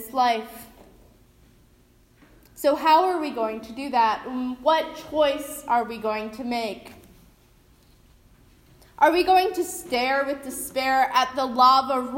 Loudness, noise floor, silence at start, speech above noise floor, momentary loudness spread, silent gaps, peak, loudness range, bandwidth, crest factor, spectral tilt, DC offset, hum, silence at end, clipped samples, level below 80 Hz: -23 LUFS; -57 dBFS; 0 s; 35 dB; 12 LU; none; -6 dBFS; 6 LU; 16.5 kHz; 20 dB; -2.5 dB/octave; under 0.1%; none; 0 s; under 0.1%; -58 dBFS